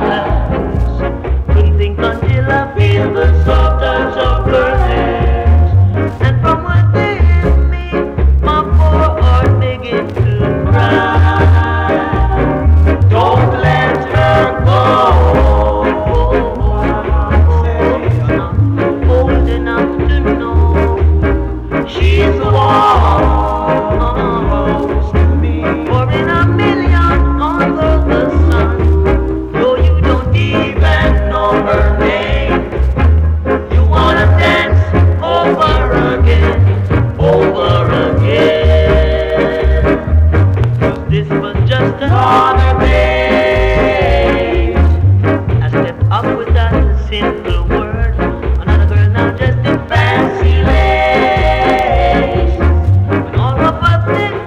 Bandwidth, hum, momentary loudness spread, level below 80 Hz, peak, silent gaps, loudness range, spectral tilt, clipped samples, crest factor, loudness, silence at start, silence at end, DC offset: 6.6 kHz; none; 5 LU; -16 dBFS; -2 dBFS; none; 2 LU; -8 dB/octave; under 0.1%; 8 dB; -12 LUFS; 0 s; 0 s; under 0.1%